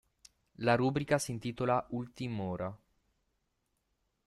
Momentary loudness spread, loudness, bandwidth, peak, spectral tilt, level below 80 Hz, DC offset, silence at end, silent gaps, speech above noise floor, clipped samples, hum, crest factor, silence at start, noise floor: 10 LU; -34 LUFS; 13 kHz; -16 dBFS; -6 dB/octave; -64 dBFS; under 0.1%; 1.5 s; none; 48 dB; under 0.1%; none; 20 dB; 0.6 s; -81 dBFS